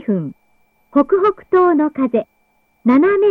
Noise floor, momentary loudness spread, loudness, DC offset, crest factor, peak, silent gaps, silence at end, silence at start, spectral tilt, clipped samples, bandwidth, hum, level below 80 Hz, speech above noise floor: -61 dBFS; 9 LU; -16 LUFS; under 0.1%; 14 dB; -2 dBFS; none; 0 s; 0.1 s; -9.5 dB/octave; under 0.1%; 4.6 kHz; none; -58 dBFS; 47 dB